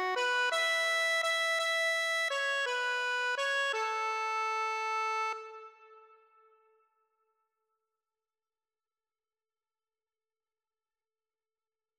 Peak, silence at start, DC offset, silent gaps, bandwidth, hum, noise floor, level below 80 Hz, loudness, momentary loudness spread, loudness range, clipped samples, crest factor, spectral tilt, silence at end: -22 dBFS; 0 s; under 0.1%; none; 16 kHz; none; under -90 dBFS; under -90 dBFS; -30 LUFS; 5 LU; 10 LU; under 0.1%; 14 dB; 2 dB/octave; 6 s